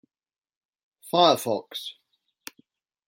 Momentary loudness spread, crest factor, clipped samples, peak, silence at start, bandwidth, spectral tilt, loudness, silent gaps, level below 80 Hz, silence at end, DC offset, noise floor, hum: 25 LU; 24 dB; under 0.1%; -4 dBFS; 1.05 s; 16.5 kHz; -4 dB/octave; -23 LUFS; none; -78 dBFS; 1.15 s; under 0.1%; under -90 dBFS; none